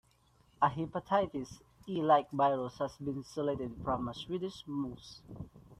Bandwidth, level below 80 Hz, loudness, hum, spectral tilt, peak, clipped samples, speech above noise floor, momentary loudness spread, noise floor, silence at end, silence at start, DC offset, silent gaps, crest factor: 13.5 kHz; -62 dBFS; -34 LUFS; none; -6.5 dB/octave; -14 dBFS; under 0.1%; 34 dB; 20 LU; -68 dBFS; 0.05 s; 0.6 s; under 0.1%; none; 20 dB